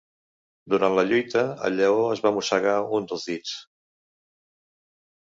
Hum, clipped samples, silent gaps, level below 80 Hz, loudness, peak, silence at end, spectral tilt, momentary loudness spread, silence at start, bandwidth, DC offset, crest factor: none; under 0.1%; none; -68 dBFS; -23 LUFS; -6 dBFS; 1.75 s; -4.5 dB/octave; 10 LU; 0.65 s; 7.8 kHz; under 0.1%; 20 dB